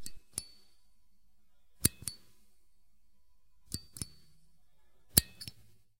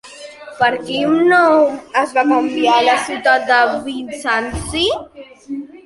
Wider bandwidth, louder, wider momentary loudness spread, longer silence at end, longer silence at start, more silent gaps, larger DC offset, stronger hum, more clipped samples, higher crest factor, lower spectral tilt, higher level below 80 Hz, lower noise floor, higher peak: first, 16 kHz vs 11.5 kHz; second, -33 LUFS vs -15 LUFS; about the same, 18 LU vs 17 LU; first, 0.5 s vs 0.05 s; about the same, 0 s vs 0.05 s; neither; first, 0.2% vs under 0.1%; neither; neither; first, 40 dB vs 14 dB; second, -2 dB/octave vs -4 dB/octave; second, -56 dBFS vs -42 dBFS; first, -72 dBFS vs -35 dBFS; about the same, 0 dBFS vs -2 dBFS